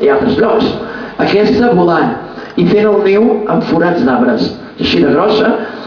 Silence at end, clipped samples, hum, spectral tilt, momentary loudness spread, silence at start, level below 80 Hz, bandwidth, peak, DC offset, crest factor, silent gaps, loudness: 0 s; under 0.1%; none; -7.5 dB/octave; 8 LU; 0 s; -42 dBFS; 5.4 kHz; 0 dBFS; under 0.1%; 10 dB; none; -11 LUFS